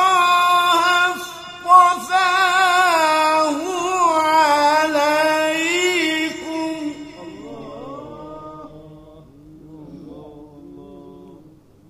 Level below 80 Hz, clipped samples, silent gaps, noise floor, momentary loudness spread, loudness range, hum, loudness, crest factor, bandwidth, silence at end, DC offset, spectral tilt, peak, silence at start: -58 dBFS; under 0.1%; none; -48 dBFS; 21 LU; 22 LU; none; -16 LUFS; 18 dB; 15.5 kHz; 0.6 s; under 0.1%; -2 dB/octave; 0 dBFS; 0 s